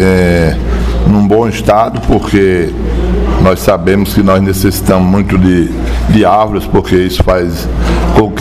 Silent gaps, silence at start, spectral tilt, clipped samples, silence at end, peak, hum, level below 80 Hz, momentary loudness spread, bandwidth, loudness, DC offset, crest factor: none; 0 s; -6.5 dB/octave; 0.4%; 0 s; 0 dBFS; none; -16 dBFS; 6 LU; 16 kHz; -10 LUFS; 0.9%; 8 dB